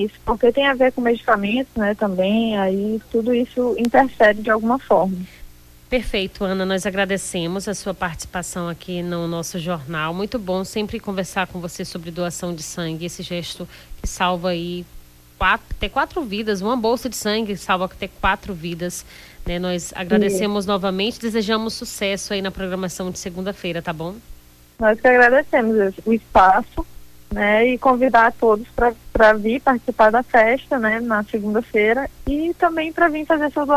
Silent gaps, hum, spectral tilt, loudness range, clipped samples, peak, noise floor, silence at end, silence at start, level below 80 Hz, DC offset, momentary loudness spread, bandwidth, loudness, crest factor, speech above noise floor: none; none; -4.5 dB/octave; 9 LU; under 0.1%; -4 dBFS; -41 dBFS; 0 s; 0 s; -40 dBFS; under 0.1%; 13 LU; 16 kHz; -20 LUFS; 16 dB; 22 dB